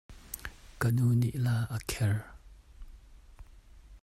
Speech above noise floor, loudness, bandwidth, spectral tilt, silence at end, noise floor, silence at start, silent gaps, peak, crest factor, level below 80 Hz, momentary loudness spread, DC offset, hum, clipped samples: 25 dB; -31 LUFS; 16 kHz; -6 dB/octave; 0.05 s; -53 dBFS; 0.1 s; none; -14 dBFS; 20 dB; -50 dBFS; 17 LU; under 0.1%; none; under 0.1%